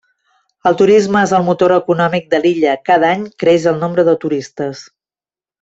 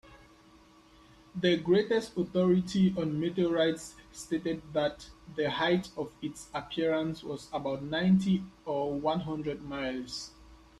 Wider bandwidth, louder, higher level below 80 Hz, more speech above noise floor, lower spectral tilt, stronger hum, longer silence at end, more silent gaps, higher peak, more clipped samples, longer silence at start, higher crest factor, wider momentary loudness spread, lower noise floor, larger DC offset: second, 8 kHz vs 12 kHz; first, -13 LUFS vs -31 LUFS; about the same, -56 dBFS vs -60 dBFS; first, over 77 dB vs 28 dB; about the same, -6 dB/octave vs -6 dB/octave; neither; first, 0.8 s vs 0.25 s; neither; first, -2 dBFS vs -12 dBFS; neither; first, 0.65 s vs 0.05 s; second, 12 dB vs 18 dB; second, 10 LU vs 13 LU; first, under -90 dBFS vs -58 dBFS; neither